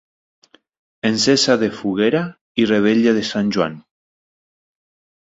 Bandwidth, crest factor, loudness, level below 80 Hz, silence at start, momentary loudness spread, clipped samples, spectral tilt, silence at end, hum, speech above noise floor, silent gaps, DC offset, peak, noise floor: 8 kHz; 18 dB; -17 LUFS; -58 dBFS; 1.05 s; 8 LU; under 0.1%; -4.5 dB/octave; 1.4 s; none; over 73 dB; 2.41-2.55 s; under 0.1%; -2 dBFS; under -90 dBFS